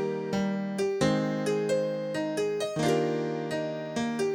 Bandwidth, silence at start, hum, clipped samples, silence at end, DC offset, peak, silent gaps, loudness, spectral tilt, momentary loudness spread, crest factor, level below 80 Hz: 16.5 kHz; 0 s; none; under 0.1%; 0 s; under 0.1%; -12 dBFS; none; -29 LUFS; -5.5 dB/octave; 5 LU; 16 dB; -62 dBFS